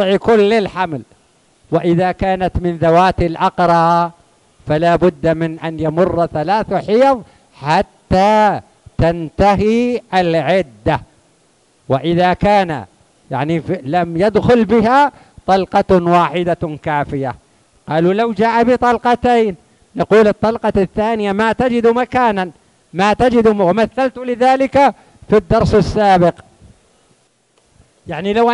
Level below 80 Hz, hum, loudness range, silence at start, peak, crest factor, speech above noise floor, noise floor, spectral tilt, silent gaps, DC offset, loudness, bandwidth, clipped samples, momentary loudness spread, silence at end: -36 dBFS; none; 3 LU; 0 s; 0 dBFS; 14 dB; 44 dB; -57 dBFS; -7 dB/octave; none; under 0.1%; -14 LUFS; 11.5 kHz; under 0.1%; 10 LU; 0 s